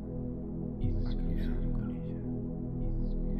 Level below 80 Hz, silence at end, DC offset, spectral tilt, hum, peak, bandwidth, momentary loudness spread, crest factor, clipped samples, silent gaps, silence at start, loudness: -36 dBFS; 0 s; under 0.1%; -11 dB/octave; none; -20 dBFS; 5 kHz; 4 LU; 12 dB; under 0.1%; none; 0 s; -36 LUFS